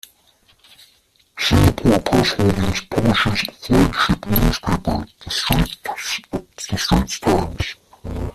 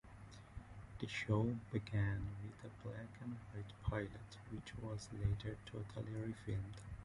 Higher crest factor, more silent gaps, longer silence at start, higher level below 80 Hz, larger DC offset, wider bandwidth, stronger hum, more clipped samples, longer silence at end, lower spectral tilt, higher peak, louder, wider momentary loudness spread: about the same, 18 dB vs 20 dB; neither; first, 1.35 s vs 0.05 s; first, -30 dBFS vs -56 dBFS; neither; first, 15 kHz vs 11 kHz; neither; neither; about the same, 0.05 s vs 0 s; second, -5 dB/octave vs -7 dB/octave; first, -2 dBFS vs -24 dBFS; first, -19 LUFS vs -45 LUFS; second, 12 LU vs 16 LU